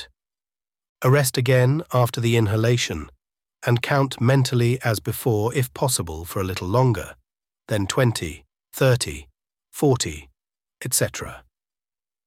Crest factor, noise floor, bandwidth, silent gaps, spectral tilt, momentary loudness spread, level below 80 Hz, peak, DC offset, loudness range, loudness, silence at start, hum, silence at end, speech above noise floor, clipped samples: 18 dB; under -90 dBFS; 16.5 kHz; 0.89-0.95 s; -5 dB/octave; 15 LU; -48 dBFS; -4 dBFS; under 0.1%; 4 LU; -22 LUFS; 0 s; none; 0.85 s; over 69 dB; under 0.1%